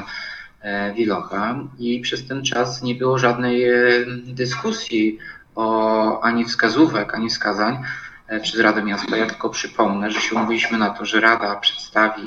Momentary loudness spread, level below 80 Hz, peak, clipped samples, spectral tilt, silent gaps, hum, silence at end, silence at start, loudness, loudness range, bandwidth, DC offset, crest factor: 11 LU; -56 dBFS; 0 dBFS; under 0.1%; -4 dB/octave; none; none; 0 s; 0 s; -20 LUFS; 2 LU; 8 kHz; under 0.1%; 20 dB